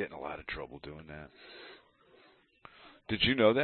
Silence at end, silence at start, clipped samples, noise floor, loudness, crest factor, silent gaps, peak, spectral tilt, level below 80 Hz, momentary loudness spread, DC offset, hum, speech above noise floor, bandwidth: 0 s; 0 s; under 0.1%; -64 dBFS; -32 LUFS; 24 dB; none; -12 dBFS; -8.5 dB/octave; -56 dBFS; 25 LU; under 0.1%; none; 32 dB; 4.4 kHz